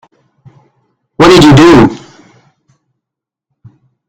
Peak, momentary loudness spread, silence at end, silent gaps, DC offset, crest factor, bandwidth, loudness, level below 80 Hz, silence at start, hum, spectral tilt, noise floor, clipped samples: 0 dBFS; 9 LU; 2.15 s; none; under 0.1%; 10 dB; 15 kHz; -4 LUFS; -32 dBFS; 1.2 s; none; -6 dB/octave; -81 dBFS; 3%